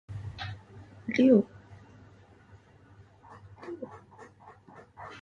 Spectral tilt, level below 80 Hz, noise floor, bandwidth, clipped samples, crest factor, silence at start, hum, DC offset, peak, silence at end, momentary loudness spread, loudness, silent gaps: -7.5 dB/octave; -60 dBFS; -56 dBFS; 7 kHz; under 0.1%; 22 dB; 0.1 s; none; under 0.1%; -10 dBFS; 0 s; 30 LU; -28 LUFS; none